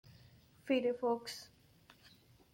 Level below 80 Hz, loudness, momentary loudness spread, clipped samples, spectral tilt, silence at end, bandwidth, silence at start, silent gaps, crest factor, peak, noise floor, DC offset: -76 dBFS; -37 LUFS; 21 LU; under 0.1%; -4.5 dB/octave; 0.45 s; 16.5 kHz; 0.65 s; none; 18 dB; -22 dBFS; -65 dBFS; under 0.1%